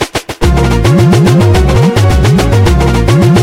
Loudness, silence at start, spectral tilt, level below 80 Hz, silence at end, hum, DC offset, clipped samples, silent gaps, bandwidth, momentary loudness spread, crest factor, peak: -8 LUFS; 0 s; -6.5 dB/octave; -16 dBFS; 0 s; none; under 0.1%; under 0.1%; none; 16 kHz; 4 LU; 6 dB; 0 dBFS